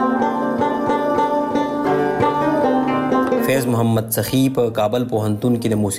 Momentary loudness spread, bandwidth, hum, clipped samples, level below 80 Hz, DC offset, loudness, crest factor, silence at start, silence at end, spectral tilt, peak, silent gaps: 2 LU; 16 kHz; none; under 0.1%; -50 dBFS; under 0.1%; -18 LUFS; 14 dB; 0 s; 0 s; -6 dB/octave; -4 dBFS; none